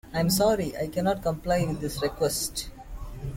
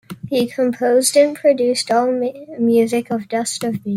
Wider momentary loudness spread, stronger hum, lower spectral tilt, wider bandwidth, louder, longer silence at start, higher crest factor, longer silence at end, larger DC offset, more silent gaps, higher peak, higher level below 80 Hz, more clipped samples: first, 16 LU vs 8 LU; neither; about the same, -4.5 dB/octave vs -4 dB/octave; about the same, 17 kHz vs 16 kHz; second, -27 LUFS vs -17 LUFS; about the same, 0.05 s vs 0.1 s; about the same, 16 dB vs 16 dB; about the same, 0 s vs 0 s; neither; neither; second, -12 dBFS vs -2 dBFS; first, -42 dBFS vs -62 dBFS; neither